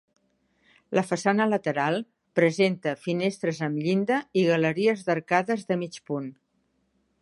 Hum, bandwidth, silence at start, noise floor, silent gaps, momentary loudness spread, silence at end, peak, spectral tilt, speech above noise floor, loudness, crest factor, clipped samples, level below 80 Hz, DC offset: none; 11.5 kHz; 0.9 s; -72 dBFS; none; 8 LU; 0.9 s; -6 dBFS; -6 dB/octave; 47 dB; -26 LUFS; 20 dB; under 0.1%; -74 dBFS; under 0.1%